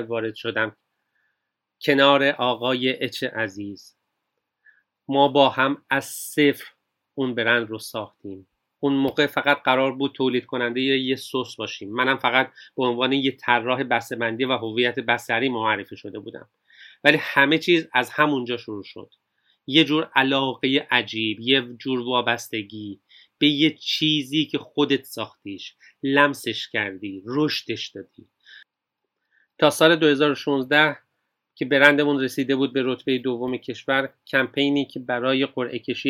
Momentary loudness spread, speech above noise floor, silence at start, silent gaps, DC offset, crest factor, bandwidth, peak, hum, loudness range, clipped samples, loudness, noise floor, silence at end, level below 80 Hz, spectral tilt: 15 LU; 59 dB; 0 s; none; under 0.1%; 24 dB; 17 kHz; 0 dBFS; none; 4 LU; under 0.1%; -22 LUFS; -82 dBFS; 0 s; -74 dBFS; -4.5 dB/octave